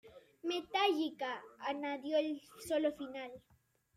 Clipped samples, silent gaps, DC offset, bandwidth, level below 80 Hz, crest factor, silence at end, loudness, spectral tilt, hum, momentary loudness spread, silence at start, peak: under 0.1%; none; under 0.1%; 15.5 kHz; -78 dBFS; 18 dB; 0.6 s; -38 LUFS; -3 dB/octave; none; 12 LU; 0.05 s; -20 dBFS